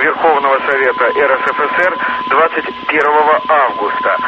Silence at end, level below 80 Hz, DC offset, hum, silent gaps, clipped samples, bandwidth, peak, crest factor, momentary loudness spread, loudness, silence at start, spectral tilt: 0 s; -54 dBFS; under 0.1%; none; none; under 0.1%; 8 kHz; 0 dBFS; 12 dB; 4 LU; -12 LUFS; 0 s; -5 dB/octave